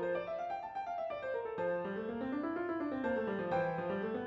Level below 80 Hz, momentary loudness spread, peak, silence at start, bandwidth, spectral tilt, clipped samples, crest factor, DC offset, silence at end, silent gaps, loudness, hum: -70 dBFS; 5 LU; -24 dBFS; 0 s; 6.8 kHz; -8 dB/octave; under 0.1%; 14 dB; under 0.1%; 0 s; none; -38 LUFS; none